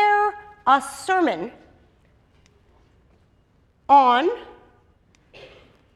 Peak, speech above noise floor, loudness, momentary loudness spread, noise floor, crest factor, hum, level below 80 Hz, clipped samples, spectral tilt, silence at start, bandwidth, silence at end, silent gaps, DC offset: -4 dBFS; 42 dB; -20 LUFS; 19 LU; -60 dBFS; 20 dB; none; -60 dBFS; under 0.1%; -3.5 dB/octave; 0 s; 12.5 kHz; 1.5 s; none; under 0.1%